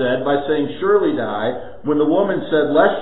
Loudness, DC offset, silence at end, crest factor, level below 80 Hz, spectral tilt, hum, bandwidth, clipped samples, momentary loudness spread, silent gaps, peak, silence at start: -18 LUFS; 2%; 0 s; 16 dB; -52 dBFS; -11 dB/octave; none; 4.1 kHz; under 0.1%; 7 LU; none; 0 dBFS; 0 s